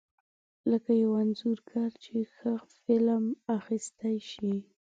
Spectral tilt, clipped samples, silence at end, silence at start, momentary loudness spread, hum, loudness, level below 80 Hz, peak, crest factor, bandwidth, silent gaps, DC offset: -6.5 dB/octave; under 0.1%; 0.25 s; 0.65 s; 9 LU; none; -31 LUFS; -76 dBFS; -14 dBFS; 16 dB; 9 kHz; none; under 0.1%